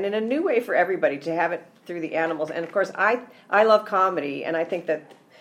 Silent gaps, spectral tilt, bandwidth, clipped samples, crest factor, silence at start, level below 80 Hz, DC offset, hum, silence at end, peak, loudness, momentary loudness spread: none; -5.5 dB/octave; 14.5 kHz; under 0.1%; 18 dB; 0 s; -78 dBFS; under 0.1%; none; 0.25 s; -6 dBFS; -23 LUFS; 10 LU